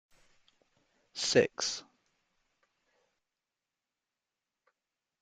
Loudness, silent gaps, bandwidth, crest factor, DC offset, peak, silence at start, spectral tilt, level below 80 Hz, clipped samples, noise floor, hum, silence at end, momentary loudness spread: -31 LUFS; none; 9.6 kHz; 28 dB; under 0.1%; -10 dBFS; 1.15 s; -2.5 dB/octave; -78 dBFS; under 0.1%; -90 dBFS; none; 3.4 s; 15 LU